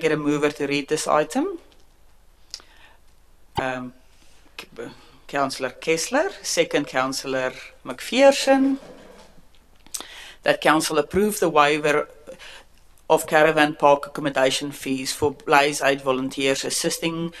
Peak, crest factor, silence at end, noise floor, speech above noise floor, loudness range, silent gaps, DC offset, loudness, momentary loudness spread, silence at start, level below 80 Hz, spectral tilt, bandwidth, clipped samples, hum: 0 dBFS; 22 dB; 0 s; -51 dBFS; 30 dB; 11 LU; none; under 0.1%; -21 LUFS; 21 LU; 0 s; -54 dBFS; -3.5 dB/octave; 13.5 kHz; under 0.1%; none